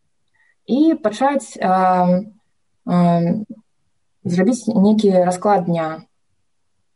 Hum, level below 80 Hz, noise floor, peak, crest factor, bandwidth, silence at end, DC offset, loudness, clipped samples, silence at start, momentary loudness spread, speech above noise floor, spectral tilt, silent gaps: none; -64 dBFS; -75 dBFS; -6 dBFS; 14 dB; 11.5 kHz; 0.95 s; under 0.1%; -17 LUFS; under 0.1%; 0.7 s; 12 LU; 59 dB; -7.5 dB/octave; none